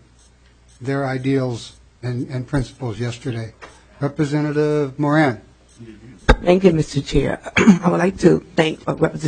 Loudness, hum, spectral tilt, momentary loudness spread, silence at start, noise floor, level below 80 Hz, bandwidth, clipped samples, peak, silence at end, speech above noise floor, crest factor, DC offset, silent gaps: -19 LUFS; none; -6.5 dB/octave; 13 LU; 0.8 s; -51 dBFS; -32 dBFS; 9.4 kHz; under 0.1%; 0 dBFS; 0 s; 33 dB; 18 dB; under 0.1%; none